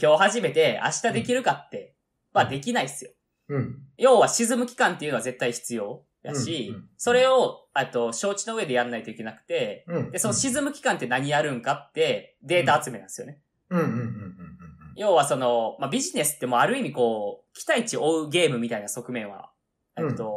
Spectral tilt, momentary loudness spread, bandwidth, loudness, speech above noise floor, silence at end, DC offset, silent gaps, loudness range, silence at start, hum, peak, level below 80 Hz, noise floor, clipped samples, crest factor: -3.5 dB/octave; 15 LU; 15 kHz; -25 LUFS; 21 dB; 0 s; under 0.1%; none; 3 LU; 0 s; none; -6 dBFS; -66 dBFS; -45 dBFS; under 0.1%; 18 dB